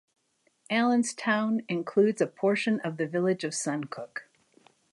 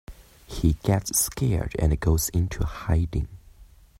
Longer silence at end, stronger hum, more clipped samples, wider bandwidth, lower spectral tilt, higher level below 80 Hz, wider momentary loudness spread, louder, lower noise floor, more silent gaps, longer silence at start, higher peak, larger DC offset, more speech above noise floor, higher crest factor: first, 0.7 s vs 0.35 s; neither; neither; second, 11.5 kHz vs 16 kHz; about the same, -4.5 dB/octave vs -5 dB/octave; second, -80 dBFS vs -34 dBFS; first, 11 LU vs 8 LU; second, -28 LUFS vs -25 LUFS; first, -71 dBFS vs -51 dBFS; neither; first, 0.7 s vs 0.1 s; second, -12 dBFS vs -8 dBFS; neither; first, 44 dB vs 27 dB; about the same, 18 dB vs 18 dB